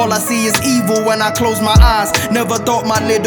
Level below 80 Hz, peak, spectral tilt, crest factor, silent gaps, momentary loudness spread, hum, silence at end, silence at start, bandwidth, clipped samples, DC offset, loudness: -20 dBFS; 0 dBFS; -4 dB/octave; 12 dB; none; 5 LU; none; 0 s; 0 s; over 20 kHz; under 0.1%; under 0.1%; -13 LUFS